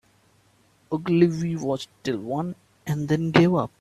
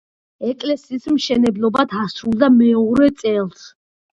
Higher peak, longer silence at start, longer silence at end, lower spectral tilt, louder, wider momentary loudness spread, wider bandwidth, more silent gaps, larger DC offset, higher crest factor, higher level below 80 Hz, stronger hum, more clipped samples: about the same, -2 dBFS vs 0 dBFS; first, 0.9 s vs 0.4 s; second, 0.15 s vs 0.5 s; about the same, -7 dB/octave vs -6 dB/octave; second, -24 LUFS vs -17 LUFS; about the same, 12 LU vs 11 LU; first, 13 kHz vs 7.8 kHz; neither; neither; first, 24 dB vs 16 dB; second, -58 dBFS vs -52 dBFS; neither; neither